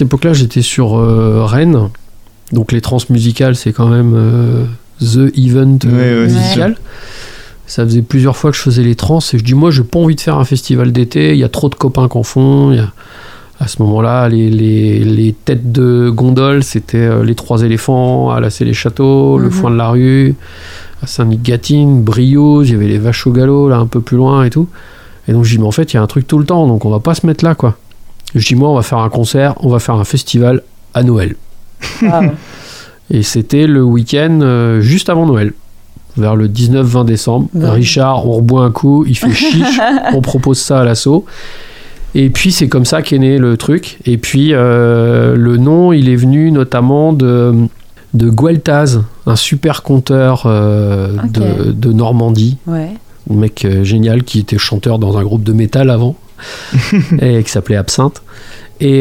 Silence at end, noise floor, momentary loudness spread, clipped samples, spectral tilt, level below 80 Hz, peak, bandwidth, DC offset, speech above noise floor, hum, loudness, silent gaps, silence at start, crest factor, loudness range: 0 s; -32 dBFS; 7 LU; under 0.1%; -6.5 dB/octave; -34 dBFS; 0 dBFS; 15 kHz; under 0.1%; 23 dB; none; -10 LUFS; none; 0 s; 10 dB; 3 LU